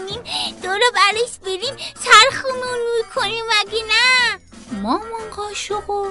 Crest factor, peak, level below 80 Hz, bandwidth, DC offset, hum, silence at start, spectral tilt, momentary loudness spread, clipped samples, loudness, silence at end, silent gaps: 18 dB; 0 dBFS; -50 dBFS; 11.5 kHz; under 0.1%; none; 0 s; -1 dB/octave; 16 LU; under 0.1%; -17 LUFS; 0 s; none